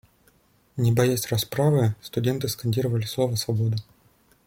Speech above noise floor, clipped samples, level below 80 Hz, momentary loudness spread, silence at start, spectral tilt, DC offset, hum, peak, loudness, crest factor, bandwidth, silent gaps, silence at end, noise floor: 38 dB; under 0.1%; -56 dBFS; 6 LU; 0.75 s; -6 dB/octave; under 0.1%; none; -8 dBFS; -24 LUFS; 18 dB; 16.5 kHz; none; 0.65 s; -61 dBFS